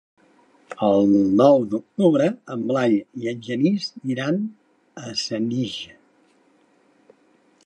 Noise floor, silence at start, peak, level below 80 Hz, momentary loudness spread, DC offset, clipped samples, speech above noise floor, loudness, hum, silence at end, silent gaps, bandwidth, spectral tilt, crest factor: -60 dBFS; 0.7 s; -2 dBFS; -64 dBFS; 14 LU; under 0.1%; under 0.1%; 39 dB; -21 LUFS; none; 1.8 s; none; 9 kHz; -6.5 dB/octave; 20 dB